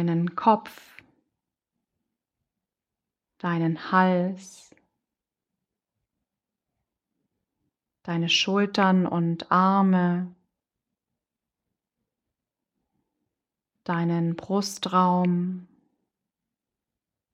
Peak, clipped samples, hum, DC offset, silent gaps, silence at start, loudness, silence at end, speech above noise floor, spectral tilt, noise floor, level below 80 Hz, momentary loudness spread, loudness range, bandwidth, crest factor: -6 dBFS; under 0.1%; none; under 0.1%; none; 0 s; -24 LUFS; 1.7 s; 65 dB; -6 dB/octave; -88 dBFS; -74 dBFS; 12 LU; 11 LU; 13.5 kHz; 22 dB